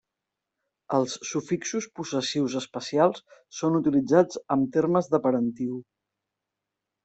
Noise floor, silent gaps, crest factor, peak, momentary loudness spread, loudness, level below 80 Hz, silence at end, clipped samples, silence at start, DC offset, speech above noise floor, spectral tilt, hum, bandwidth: -86 dBFS; none; 20 dB; -6 dBFS; 10 LU; -26 LUFS; -68 dBFS; 1.2 s; under 0.1%; 0.9 s; under 0.1%; 60 dB; -5.5 dB/octave; none; 8.2 kHz